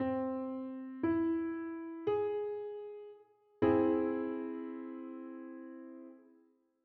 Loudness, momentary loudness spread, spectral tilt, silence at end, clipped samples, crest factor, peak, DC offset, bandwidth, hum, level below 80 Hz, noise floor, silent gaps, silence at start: -36 LUFS; 18 LU; -7 dB/octave; 0.6 s; under 0.1%; 20 dB; -16 dBFS; under 0.1%; 4.3 kHz; none; -72 dBFS; -69 dBFS; none; 0 s